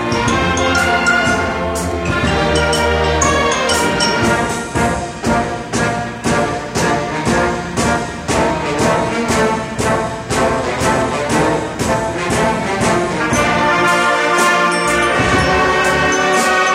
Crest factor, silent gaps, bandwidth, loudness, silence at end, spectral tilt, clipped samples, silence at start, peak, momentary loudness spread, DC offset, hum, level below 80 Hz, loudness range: 14 dB; none; 16.5 kHz; -15 LUFS; 0 s; -4 dB/octave; under 0.1%; 0 s; -2 dBFS; 5 LU; under 0.1%; none; -32 dBFS; 4 LU